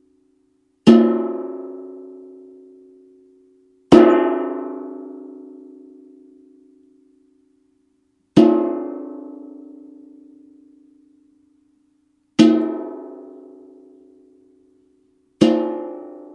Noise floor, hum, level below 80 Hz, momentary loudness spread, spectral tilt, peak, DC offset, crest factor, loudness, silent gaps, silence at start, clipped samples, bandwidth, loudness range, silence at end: -65 dBFS; none; -60 dBFS; 27 LU; -7 dB/octave; 0 dBFS; under 0.1%; 22 dB; -17 LUFS; none; 0.85 s; under 0.1%; 10 kHz; 11 LU; 0.15 s